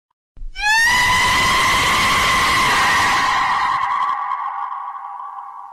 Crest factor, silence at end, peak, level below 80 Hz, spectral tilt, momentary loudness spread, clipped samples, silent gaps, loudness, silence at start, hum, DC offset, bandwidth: 10 dB; 0 s; -8 dBFS; -38 dBFS; -1 dB/octave; 17 LU; under 0.1%; none; -15 LUFS; 0.35 s; none; under 0.1%; 16.5 kHz